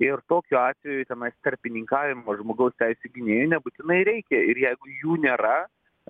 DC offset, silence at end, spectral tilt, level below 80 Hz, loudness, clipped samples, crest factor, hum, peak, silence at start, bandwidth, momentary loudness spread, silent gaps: under 0.1%; 0.45 s; -9 dB/octave; -70 dBFS; -24 LUFS; under 0.1%; 18 dB; none; -6 dBFS; 0 s; 3.9 kHz; 9 LU; none